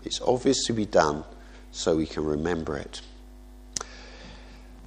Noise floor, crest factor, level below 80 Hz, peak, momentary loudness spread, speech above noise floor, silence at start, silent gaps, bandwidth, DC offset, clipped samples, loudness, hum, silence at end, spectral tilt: -46 dBFS; 24 dB; -46 dBFS; -4 dBFS; 22 LU; 21 dB; 0 s; none; 12 kHz; under 0.1%; under 0.1%; -27 LUFS; none; 0 s; -4 dB/octave